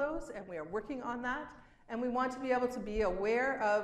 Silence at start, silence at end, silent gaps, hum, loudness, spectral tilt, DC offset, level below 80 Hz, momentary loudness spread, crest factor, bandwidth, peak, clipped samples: 0 s; 0 s; none; none; -36 LUFS; -5.5 dB/octave; under 0.1%; -54 dBFS; 11 LU; 14 dB; 12.5 kHz; -20 dBFS; under 0.1%